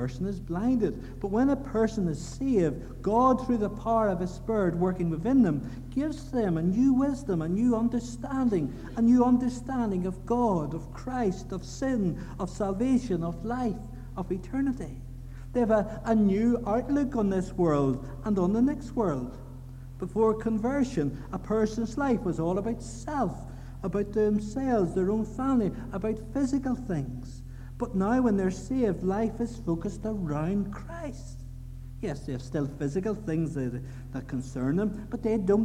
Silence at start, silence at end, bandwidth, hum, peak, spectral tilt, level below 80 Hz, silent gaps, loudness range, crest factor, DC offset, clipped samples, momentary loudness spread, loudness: 0 s; 0 s; 11 kHz; none; -12 dBFS; -8 dB/octave; -44 dBFS; none; 5 LU; 16 dB; under 0.1%; under 0.1%; 13 LU; -28 LUFS